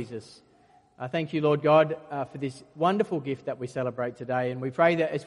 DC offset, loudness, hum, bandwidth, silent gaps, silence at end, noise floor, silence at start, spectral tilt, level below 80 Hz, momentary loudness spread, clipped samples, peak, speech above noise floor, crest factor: under 0.1%; -27 LUFS; none; 11 kHz; none; 0 s; -60 dBFS; 0 s; -7 dB/octave; -70 dBFS; 14 LU; under 0.1%; -8 dBFS; 33 dB; 20 dB